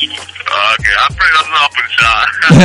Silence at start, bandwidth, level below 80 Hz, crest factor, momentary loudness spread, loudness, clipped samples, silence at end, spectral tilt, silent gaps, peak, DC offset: 0 s; 11.5 kHz; -32 dBFS; 10 dB; 7 LU; -10 LUFS; 0.6%; 0 s; -4.5 dB/octave; none; 0 dBFS; under 0.1%